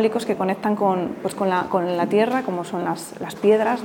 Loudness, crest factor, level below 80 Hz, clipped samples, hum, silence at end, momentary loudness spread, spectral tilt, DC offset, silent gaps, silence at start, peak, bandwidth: -22 LUFS; 16 dB; -64 dBFS; under 0.1%; none; 0 s; 8 LU; -6 dB/octave; under 0.1%; none; 0 s; -6 dBFS; 18 kHz